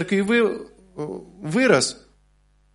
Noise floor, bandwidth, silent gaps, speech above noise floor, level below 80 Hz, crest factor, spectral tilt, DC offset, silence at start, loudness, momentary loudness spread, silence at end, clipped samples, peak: -60 dBFS; 11.5 kHz; none; 39 dB; -58 dBFS; 20 dB; -4.5 dB/octave; under 0.1%; 0 s; -21 LUFS; 17 LU; 0.8 s; under 0.1%; -2 dBFS